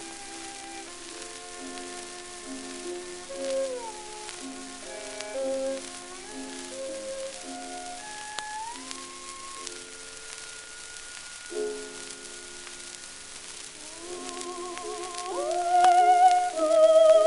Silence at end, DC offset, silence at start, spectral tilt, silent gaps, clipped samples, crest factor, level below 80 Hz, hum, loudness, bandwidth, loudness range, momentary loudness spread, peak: 0 s; under 0.1%; 0 s; -1.5 dB/octave; none; under 0.1%; 20 dB; -60 dBFS; none; -29 LUFS; 11.5 kHz; 13 LU; 19 LU; -8 dBFS